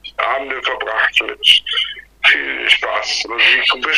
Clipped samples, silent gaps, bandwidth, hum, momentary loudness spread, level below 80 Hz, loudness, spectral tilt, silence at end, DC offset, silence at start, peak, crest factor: under 0.1%; none; 15.5 kHz; none; 8 LU; -52 dBFS; -14 LUFS; 0.5 dB/octave; 0 s; under 0.1%; 0.05 s; 0 dBFS; 16 dB